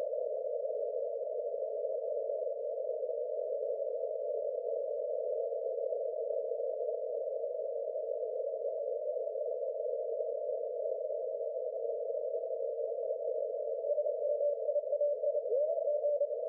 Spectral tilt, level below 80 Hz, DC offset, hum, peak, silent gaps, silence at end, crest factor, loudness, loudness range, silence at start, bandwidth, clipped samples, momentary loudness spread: 0 dB/octave; under -90 dBFS; under 0.1%; none; -24 dBFS; none; 0 s; 12 dB; -36 LUFS; 3 LU; 0 s; 0.8 kHz; under 0.1%; 5 LU